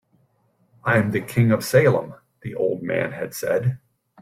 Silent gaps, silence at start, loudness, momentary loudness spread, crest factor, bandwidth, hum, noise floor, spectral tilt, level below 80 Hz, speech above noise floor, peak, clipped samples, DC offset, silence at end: none; 0.85 s; -21 LUFS; 16 LU; 20 dB; 16 kHz; none; -64 dBFS; -6.5 dB/octave; -58 dBFS; 43 dB; -4 dBFS; under 0.1%; under 0.1%; 0.45 s